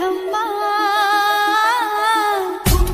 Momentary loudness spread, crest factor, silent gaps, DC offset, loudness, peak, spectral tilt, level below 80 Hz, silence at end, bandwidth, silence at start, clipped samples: 5 LU; 16 dB; none; under 0.1%; -17 LUFS; -2 dBFS; -3.5 dB/octave; -26 dBFS; 0 s; 16 kHz; 0 s; under 0.1%